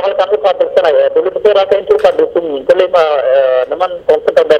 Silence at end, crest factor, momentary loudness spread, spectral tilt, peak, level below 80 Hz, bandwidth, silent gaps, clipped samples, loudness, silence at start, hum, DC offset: 0 s; 10 dB; 4 LU; -4.5 dB/octave; 0 dBFS; -50 dBFS; 8.6 kHz; none; 0.4%; -11 LUFS; 0 s; none; under 0.1%